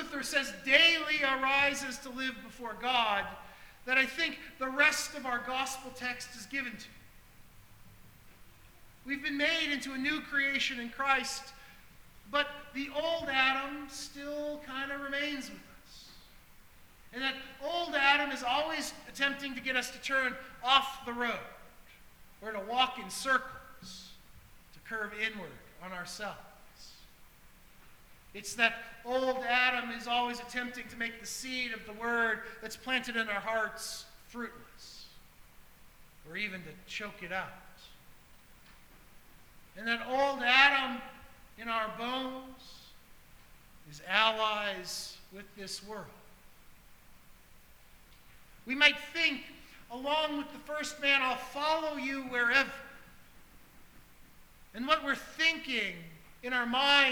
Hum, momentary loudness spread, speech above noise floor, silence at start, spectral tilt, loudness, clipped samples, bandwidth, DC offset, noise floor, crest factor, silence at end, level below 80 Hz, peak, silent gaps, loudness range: none; 21 LU; 25 dB; 0 s; -1.5 dB/octave; -31 LUFS; under 0.1%; over 20 kHz; under 0.1%; -57 dBFS; 28 dB; 0 s; -62 dBFS; -6 dBFS; none; 12 LU